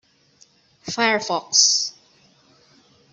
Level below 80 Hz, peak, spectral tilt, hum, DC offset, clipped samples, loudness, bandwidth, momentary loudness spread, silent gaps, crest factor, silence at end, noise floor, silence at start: -70 dBFS; -2 dBFS; 0 dB/octave; none; under 0.1%; under 0.1%; -18 LUFS; 8.2 kHz; 15 LU; none; 22 dB; 1.2 s; -57 dBFS; 0.85 s